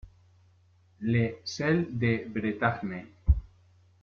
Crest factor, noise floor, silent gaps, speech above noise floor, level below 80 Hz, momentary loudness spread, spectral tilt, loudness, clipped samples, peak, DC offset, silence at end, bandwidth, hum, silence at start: 20 dB; -62 dBFS; none; 34 dB; -38 dBFS; 8 LU; -7 dB/octave; -29 LUFS; under 0.1%; -10 dBFS; under 0.1%; 0.55 s; 7 kHz; none; 0.05 s